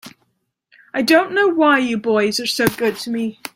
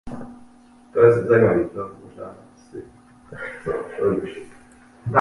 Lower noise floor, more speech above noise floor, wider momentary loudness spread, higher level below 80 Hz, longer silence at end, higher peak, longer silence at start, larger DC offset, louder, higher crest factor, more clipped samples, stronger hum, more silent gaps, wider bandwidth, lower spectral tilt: first, -68 dBFS vs -50 dBFS; first, 51 dB vs 32 dB; second, 10 LU vs 24 LU; about the same, -56 dBFS vs -52 dBFS; about the same, 0.05 s vs 0 s; about the same, -2 dBFS vs -2 dBFS; about the same, 0.05 s vs 0.05 s; neither; first, -17 LUFS vs -20 LUFS; second, 16 dB vs 22 dB; neither; neither; neither; first, 16.5 kHz vs 11 kHz; second, -4 dB/octave vs -8.5 dB/octave